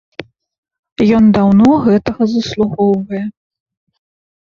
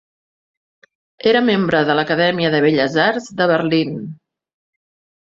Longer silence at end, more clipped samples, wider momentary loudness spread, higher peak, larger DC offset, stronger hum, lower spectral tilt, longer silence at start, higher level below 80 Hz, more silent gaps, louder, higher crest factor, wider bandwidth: first, 1.2 s vs 1.05 s; neither; first, 19 LU vs 6 LU; about the same, 0 dBFS vs -2 dBFS; neither; neither; first, -8 dB/octave vs -6 dB/octave; second, 0.2 s vs 1.25 s; first, -44 dBFS vs -58 dBFS; first, 0.58-0.63 s, 0.79-0.83 s, 0.92-0.96 s vs none; first, -12 LUFS vs -16 LUFS; about the same, 14 dB vs 16 dB; about the same, 7 kHz vs 7.6 kHz